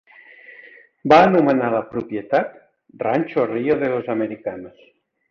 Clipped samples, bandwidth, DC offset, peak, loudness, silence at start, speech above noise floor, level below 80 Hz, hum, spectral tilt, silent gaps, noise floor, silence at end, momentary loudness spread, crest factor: under 0.1%; 7 kHz; under 0.1%; -2 dBFS; -19 LUFS; 0.5 s; 28 dB; -58 dBFS; none; -7.5 dB/octave; none; -46 dBFS; 0.6 s; 17 LU; 18 dB